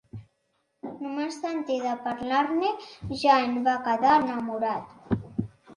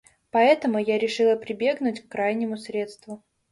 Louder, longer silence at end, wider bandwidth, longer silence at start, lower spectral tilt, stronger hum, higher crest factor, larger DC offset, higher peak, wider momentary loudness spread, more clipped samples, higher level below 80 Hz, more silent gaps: about the same, -26 LUFS vs -24 LUFS; second, 0 s vs 0.35 s; about the same, 11 kHz vs 11.5 kHz; second, 0.15 s vs 0.35 s; about the same, -6 dB/octave vs -5 dB/octave; neither; about the same, 20 dB vs 18 dB; neither; about the same, -8 dBFS vs -6 dBFS; about the same, 15 LU vs 15 LU; neither; first, -56 dBFS vs -70 dBFS; neither